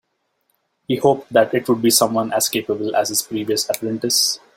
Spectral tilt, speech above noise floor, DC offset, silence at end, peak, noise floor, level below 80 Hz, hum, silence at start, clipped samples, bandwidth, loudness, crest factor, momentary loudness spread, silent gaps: -3 dB/octave; 50 dB; under 0.1%; 0.2 s; -2 dBFS; -69 dBFS; -60 dBFS; none; 0.9 s; under 0.1%; 16.5 kHz; -18 LUFS; 18 dB; 7 LU; none